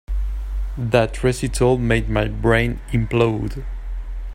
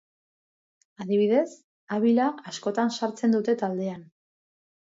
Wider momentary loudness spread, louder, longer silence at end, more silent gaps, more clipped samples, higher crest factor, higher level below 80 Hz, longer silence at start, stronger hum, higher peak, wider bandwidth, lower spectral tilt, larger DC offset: about the same, 14 LU vs 12 LU; first, -20 LUFS vs -26 LUFS; second, 0 s vs 0.85 s; second, none vs 1.64-1.87 s; neither; about the same, 18 dB vs 16 dB; first, -26 dBFS vs -76 dBFS; second, 0.1 s vs 1 s; neither; first, -2 dBFS vs -10 dBFS; first, 15 kHz vs 7.8 kHz; about the same, -6.5 dB/octave vs -6 dB/octave; neither